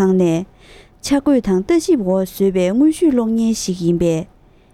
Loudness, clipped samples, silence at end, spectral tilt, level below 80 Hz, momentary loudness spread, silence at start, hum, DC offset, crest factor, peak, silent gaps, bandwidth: -16 LUFS; under 0.1%; 0.5 s; -6.5 dB/octave; -44 dBFS; 9 LU; 0 s; none; under 0.1%; 12 dB; -4 dBFS; none; 15.5 kHz